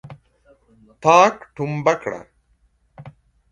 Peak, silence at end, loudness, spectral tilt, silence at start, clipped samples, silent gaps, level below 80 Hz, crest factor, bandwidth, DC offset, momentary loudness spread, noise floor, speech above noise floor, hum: 0 dBFS; 0.45 s; -18 LUFS; -5 dB/octave; 0.05 s; under 0.1%; none; -60 dBFS; 22 dB; 10 kHz; under 0.1%; 17 LU; -62 dBFS; 44 dB; none